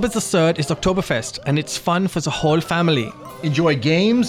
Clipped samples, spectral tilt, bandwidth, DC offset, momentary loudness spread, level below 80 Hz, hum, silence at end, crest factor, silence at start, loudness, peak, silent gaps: under 0.1%; -5 dB/octave; 15.5 kHz; under 0.1%; 6 LU; -44 dBFS; none; 0 s; 12 dB; 0 s; -19 LUFS; -6 dBFS; none